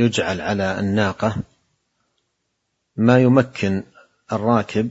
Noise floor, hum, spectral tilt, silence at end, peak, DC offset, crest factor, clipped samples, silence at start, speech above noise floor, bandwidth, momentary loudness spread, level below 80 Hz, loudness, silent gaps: -74 dBFS; none; -6.5 dB/octave; 0 s; 0 dBFS; under 0.1%; 20 dB; under 0.1%; 0 s; 55 dB; 8 kHz; 13 LU; -54 dBFS; -19 LUFS; none